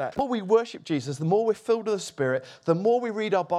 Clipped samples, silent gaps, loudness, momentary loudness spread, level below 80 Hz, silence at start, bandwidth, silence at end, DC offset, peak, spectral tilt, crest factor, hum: under 0.1%; none; -26 LUFS; 7 LU; -66 dBFS; 0 s; 12 kHz; 0 s; under 0.1%; -8 dBFS; -6 dB/octave; 18 dB; none